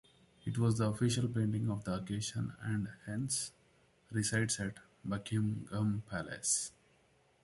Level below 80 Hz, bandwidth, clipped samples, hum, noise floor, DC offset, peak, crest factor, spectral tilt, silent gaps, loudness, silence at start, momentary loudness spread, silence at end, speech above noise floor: -62 dBFS; 11.5 kHz; under 0.1%; none; -70 dBFS; under 0.1%; -18 dBFS; 18 dB; -4.5 dB/octave; none; -36 LUFS; 0.45 s; 9 LU; 0.75 s; 35 dB